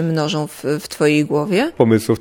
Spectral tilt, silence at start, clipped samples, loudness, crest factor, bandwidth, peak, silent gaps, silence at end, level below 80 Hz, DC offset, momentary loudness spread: -6 dB/octave; 0 s; under 0.1%; -17 LUFS; 16 dB; 19 kHz; 0 dBFS; none; 0 s; -56 dBFS; under 0.1%; 7 LU